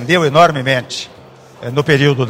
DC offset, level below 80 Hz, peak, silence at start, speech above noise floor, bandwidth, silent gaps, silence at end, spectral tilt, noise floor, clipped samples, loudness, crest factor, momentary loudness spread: under 0.1%; -52 dBFS; 0 dBFS; 0 s; 27 dB; 16 kHz; none; 0 s; -5.5 dB/octave; -40 dBFS; 0.2%; -13 LUFS; 14 dB; 16 LU